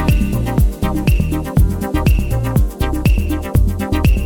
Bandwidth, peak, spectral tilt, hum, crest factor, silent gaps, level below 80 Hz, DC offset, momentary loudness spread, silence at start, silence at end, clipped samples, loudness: 19 kHz; -2 dBFS; -7 dB/octave; none; 12 dB; none; -18 dBFS; under 0.1%; 2 LU; 0 s; 0 s; under 0.1%; -17 LUFS